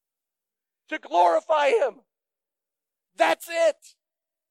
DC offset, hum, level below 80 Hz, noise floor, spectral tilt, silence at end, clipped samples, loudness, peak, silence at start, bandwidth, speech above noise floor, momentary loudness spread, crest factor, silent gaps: under 0.1%; none; under -90 dBFS; -89 dBFS; -1.5 dB/octave; 0.8 s; under 0.1%; -23 LUFS; -6 dBFS; 0.9 s; 16 kHz; 67 dB; 14 LU; 20 dB; none